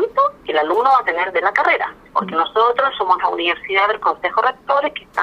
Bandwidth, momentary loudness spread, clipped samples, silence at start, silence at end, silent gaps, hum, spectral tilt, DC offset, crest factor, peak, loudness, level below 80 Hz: 10.5 kHz; 5 LU; under 0.1%; 0 s; 0 s; none; none; -4.5 dB/octave; under 0.1%; 16 dB; -2 dBFS; -17 LUFS; -56 dBFS